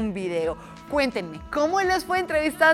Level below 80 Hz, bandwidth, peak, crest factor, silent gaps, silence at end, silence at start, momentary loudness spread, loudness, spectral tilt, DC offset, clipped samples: -48 dBFS; 16 kHz; -4 dBFS; 20 dB; none; 0 s; 0 s; 9 LU; -25 LUFS; -4.5 dB/octave; under 0.1%; under 0.1%